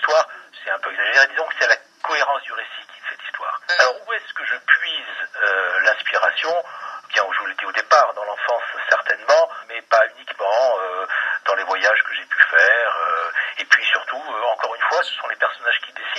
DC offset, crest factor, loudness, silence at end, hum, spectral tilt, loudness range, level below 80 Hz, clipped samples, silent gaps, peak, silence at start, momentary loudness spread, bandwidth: under 0.1%; 20 dB; -19 LUFS; 0 s; none; 2 dB/octave; 4 LU; under -90 dBFS; under 0.1%; none; 0 dBFS; 0 s; 11 LU; 10.5 kHz